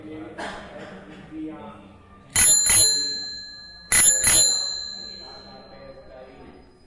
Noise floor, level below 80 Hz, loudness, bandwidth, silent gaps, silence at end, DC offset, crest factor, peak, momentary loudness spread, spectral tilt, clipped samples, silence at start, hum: -48 dBFS; -48 dBFS; -16 LUFS; 12 kHz; none; 0.35 s; under 0.1%; 18 dB; -6 dBFS; 26 LU; 0.5 dB/octave; under 0.1%; 0.05 s; none